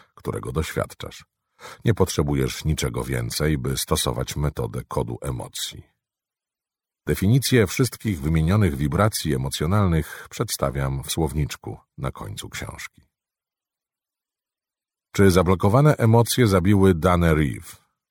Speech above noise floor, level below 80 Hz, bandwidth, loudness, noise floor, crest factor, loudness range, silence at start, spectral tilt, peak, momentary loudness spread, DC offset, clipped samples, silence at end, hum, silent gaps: over 68 dB; -38 dBFS; 18 kHz; -22 LUFS; under -90 dBFS; 20 dB; 11 LU; 0.25 s; -5.5 dB/octave; -4 dBFS; 15 LU; under 0.1%; under 0.1%; 0.35 s; none; none